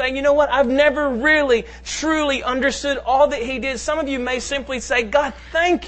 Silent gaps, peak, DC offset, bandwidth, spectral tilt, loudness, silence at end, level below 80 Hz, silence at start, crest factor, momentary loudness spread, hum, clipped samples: none; -4 dBFS; under 0.1%; 8.8 kHz; -3 dB/octave; -19 LUFS; 0 s; -40 dBFS; 0 s; 16 dB; 7 LU; none; under 0.1%